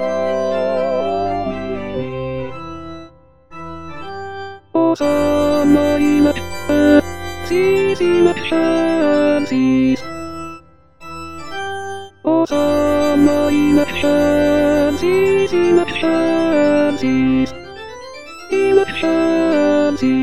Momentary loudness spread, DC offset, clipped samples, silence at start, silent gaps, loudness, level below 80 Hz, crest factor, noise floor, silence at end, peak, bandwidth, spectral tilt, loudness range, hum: 17 LU; 2%; under 0.1%; 0 s; none; -16 LUFS; -44 dBFS; 16 dB; -43 dBFS; 0 s; 0 dBFS; 12.5 kHz; -6 dB/octave; 8 LU; none